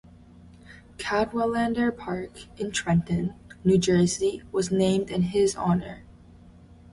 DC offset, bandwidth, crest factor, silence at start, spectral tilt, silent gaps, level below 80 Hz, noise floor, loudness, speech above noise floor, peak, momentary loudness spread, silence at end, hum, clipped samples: under 0.1%; 11.5 kHz; 16 dB; 0.45 s; -5.5 dB/octave; none; -50 dBFS; -50 dBFS; -25 LUFS; 26 dB; -10 dBFS; 12 LU; 0.9 s; none; under 0.1%